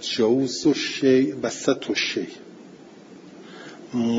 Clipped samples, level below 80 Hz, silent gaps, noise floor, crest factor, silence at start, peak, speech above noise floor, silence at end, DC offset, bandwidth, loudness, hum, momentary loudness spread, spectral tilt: under 0.1%; -68 dBFS; none; -45 dBFS; 18 dB; 0 s; -4 dBFS; 23 dB; 0 s; under 0.1%; 7.8 kHz; -22 LUFS; none; 22 LU; -4 dB/octave